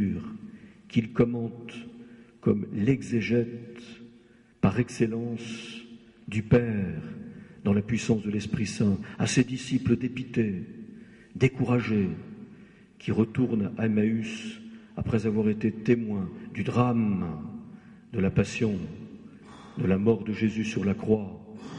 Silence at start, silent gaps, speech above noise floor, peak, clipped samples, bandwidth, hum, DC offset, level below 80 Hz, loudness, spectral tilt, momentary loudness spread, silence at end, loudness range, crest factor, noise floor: 0 s; none; 30 dB; -10 dBFS; under 0.1%; 11 kHz; none; under 0.1%; -54 dBFS; -28 LUFS; -7 dB/octave; 19 LU; 0 s; 2 LU; 18 dB; -57 dBFS